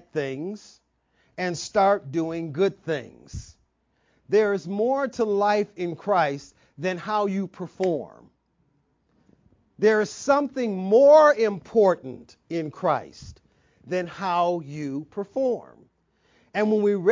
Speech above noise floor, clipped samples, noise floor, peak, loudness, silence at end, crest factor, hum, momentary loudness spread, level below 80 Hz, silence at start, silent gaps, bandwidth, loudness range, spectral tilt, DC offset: 45 dB; under 0.1%; -69 dBFS; -6 dBFS; -24 LUFS; 0 s; 18 dB; none; 13 LU; -58 dBFS; 0.15 s; none; 7.6 kHz; 8 LU; -6 dB/octave; under 0.1%